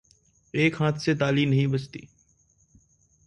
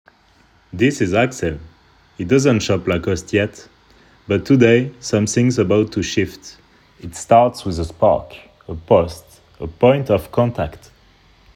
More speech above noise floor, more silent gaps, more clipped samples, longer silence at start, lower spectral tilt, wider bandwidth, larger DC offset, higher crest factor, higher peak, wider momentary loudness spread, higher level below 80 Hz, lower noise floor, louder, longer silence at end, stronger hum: about the same, 40 dB vs 37 dB; neither; neither; second, 0.55 s vs 0.75 s; about the same, -6.5 dB/octave vs -6 dB/octave; second, 9.2 kHz vs 16 kHz; neither; about the same, 18 dB vs 18 dB; second, -8 dBFS vs 0 dBFS; second, 13 LU vs 20 LU; second, -60 dBFS vs -42 dBFS; first, -64 dBFS vs -54 dBFS; second, -25 LUFS vs -17 LUFS; first, 1.2 s vs 0.8 s; neither